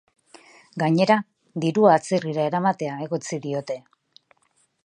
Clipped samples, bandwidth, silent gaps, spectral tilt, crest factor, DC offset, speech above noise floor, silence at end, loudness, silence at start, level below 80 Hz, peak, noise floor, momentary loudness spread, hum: under 0.1%; 10.5 kHz; none; -6 dB/octave; 22 dB; under 0.1%; 45 dB; 1.05 s; -22 LUFS; 0.75 s; -74 dBFS; -2 dBFS; -66 dBFS; 15 LU; none